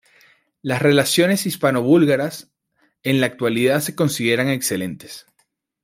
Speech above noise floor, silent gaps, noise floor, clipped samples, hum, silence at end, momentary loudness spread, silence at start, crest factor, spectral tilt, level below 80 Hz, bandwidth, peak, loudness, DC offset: 49 dB; none; -67 dBFS; under 0.1%; none; 0.65 s; 15 LU; 0.65 s; 18 dB; -4.5 dB/octave; -62 dBFS; 16 kHz; -2 dBFS; -18 LUFS; under 0.1%